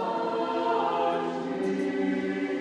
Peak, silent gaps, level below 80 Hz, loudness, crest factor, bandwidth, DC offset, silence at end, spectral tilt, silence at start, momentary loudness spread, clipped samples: -16 dBFS; none; -72 dBFS; -28 LUFS; 12 dB; 10 kHz; under 0.1%; 0 s; -6.5 dB/octave; 0 s; 4 LU; under 0.1%